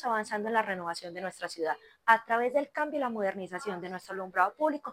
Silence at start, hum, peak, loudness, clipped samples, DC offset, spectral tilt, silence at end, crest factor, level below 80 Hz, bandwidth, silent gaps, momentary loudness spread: 0 s; none; -8 dBFS; -31 LUFS; under 0.1%; under 0.1%; -4.5 dB/octave; 0 s; 24 dB; -80 dBFS; 16 kHz; none; 12 LU